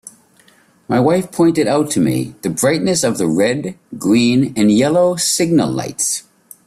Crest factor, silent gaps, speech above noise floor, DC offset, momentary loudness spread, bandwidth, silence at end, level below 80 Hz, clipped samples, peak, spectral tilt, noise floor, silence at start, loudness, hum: 14 dB; none; 36 dB; under 0.1%; 7 LU; 15 kHz; 0.45 s; -54 dBFS; under 0.1%; -2 dBFS; -4.5 dB/octave; -51 dBFS; 0.05 s; -15 LUFS; none